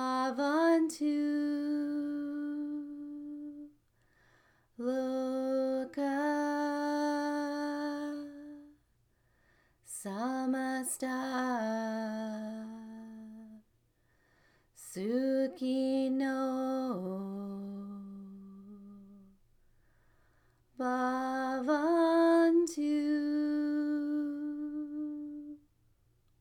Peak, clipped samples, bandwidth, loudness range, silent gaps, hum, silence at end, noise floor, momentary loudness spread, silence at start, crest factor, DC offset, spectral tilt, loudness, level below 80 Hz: -18 dBFS; under 0.1%; 17 kHz; 11 LU; none; none; 0.85 s; -72 dBFS; 19 LU; 0 s; 16 dB; under 0.1%; -5 dB/octave; -33 LUFS; -76 dBFS